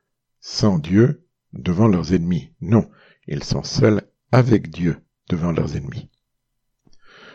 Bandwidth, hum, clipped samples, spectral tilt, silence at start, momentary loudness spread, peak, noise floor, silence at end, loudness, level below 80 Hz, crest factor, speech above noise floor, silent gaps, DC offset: 7.6 kHz; none; under 0.1%; -7 dB/octave; 0.45 s; 16 LU; 0 dBFS; -74 dBFS; 0.05 s; -20 LUFS; -44 dBFS; 20 dB; 55 dB; none; under 0.1%